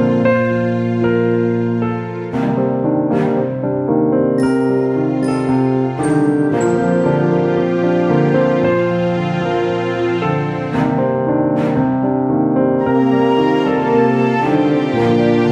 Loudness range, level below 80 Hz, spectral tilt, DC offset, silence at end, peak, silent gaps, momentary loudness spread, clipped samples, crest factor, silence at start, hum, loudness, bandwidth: 2 LU; -48 dBFS; -8 dB/octave; under 0.1%; 0 s; -2 dBFS; none; 4 LU; under 0.1%; 12 dB; 0 s; none; -15 LUFS; 10.5 kHz